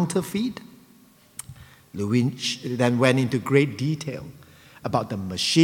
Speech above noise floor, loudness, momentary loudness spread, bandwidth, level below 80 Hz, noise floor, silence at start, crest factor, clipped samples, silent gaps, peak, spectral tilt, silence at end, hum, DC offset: 31 dB; -24 LUFS; 20 LU; 18 kHz; -60 dBFS; -54 dBFS; 0 s; 22 dB; under 0.1%; none; -2 dBFS; -5.5 dB/octave; 0 s; none; under 0.1%